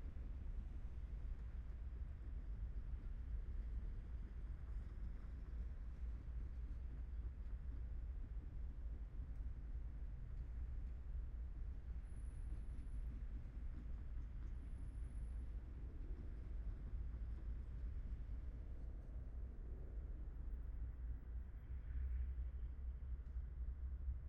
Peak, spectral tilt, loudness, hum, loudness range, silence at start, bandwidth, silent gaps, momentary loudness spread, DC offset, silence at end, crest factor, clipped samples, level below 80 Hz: -36 dBFS; -9 dB/octave; -52 LUFS; none; 2 LU; 0 s; 3.5 kHz; none; 3 LU; under 0.1%; 0 s; 12 dB; under 0.1%; -48 dBFS